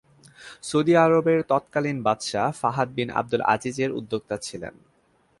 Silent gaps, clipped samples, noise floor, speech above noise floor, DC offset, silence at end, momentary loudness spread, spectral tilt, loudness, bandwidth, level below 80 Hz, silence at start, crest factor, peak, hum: none; under 0.1%; -64 dBFS; 41 dB; under 0.1%; 0.7 s; 15 LU; -5.5 dB/octave; -23 LUFS; 11.5 kHz; -62 dBFS; 0.4 s; 20 dB; -4 dBFS; none